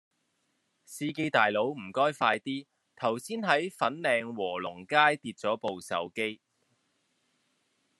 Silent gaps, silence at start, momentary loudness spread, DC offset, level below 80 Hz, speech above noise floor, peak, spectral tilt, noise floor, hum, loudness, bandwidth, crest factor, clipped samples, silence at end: none; 0.9 s; 10 LU; under 0.1%; -80 dBFS; 47 dB; -6 dBFS; -4 dB/octave; -76 dBFS; none; -29 LUFS; 12.5 kHz; 24 dB; under 0.1%; 1.65 s